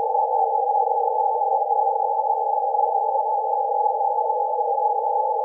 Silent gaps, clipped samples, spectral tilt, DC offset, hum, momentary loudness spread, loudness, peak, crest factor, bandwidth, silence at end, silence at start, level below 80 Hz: none; under 0.1%; -7 dB/octave; under 0.1%; none; 2 LU; -22 LUFS; -10 dBFS; 12 dB; 1 kHz; 0 s; 0 s; under -90 dBFS